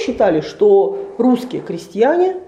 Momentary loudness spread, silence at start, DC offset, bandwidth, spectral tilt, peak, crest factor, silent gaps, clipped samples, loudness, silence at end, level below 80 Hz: 13 LU; 0 s; under 0.1%; 12 kHz; -6.5 dB/octave; -2 dBFS; 14 dB; none; under 0.1%; -15 LUFS; 0.05 s; -52 dBFS